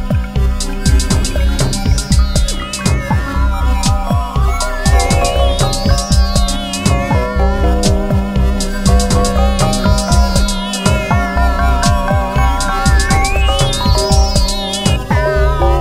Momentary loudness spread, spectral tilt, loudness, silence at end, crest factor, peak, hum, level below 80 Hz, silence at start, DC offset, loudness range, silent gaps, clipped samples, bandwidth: 4 LU; -5 dB/octave; -14 LUFS; 0 s; 12 dB; 0 dBFS; none; -14 dBFS; 0 s; 0.2%; 2 LU; none; under 0.1%; 15.5 kHz